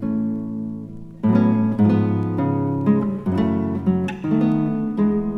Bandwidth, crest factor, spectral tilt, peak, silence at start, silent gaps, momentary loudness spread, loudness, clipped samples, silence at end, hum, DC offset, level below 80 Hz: 5.6 kHz; 16 dB; -10 dB/octave; -4 dBFS; 0 s; none; 10 LU; -20 LUFS; under 0.1%; 0 s; none; under 0.1%; -50 dBFS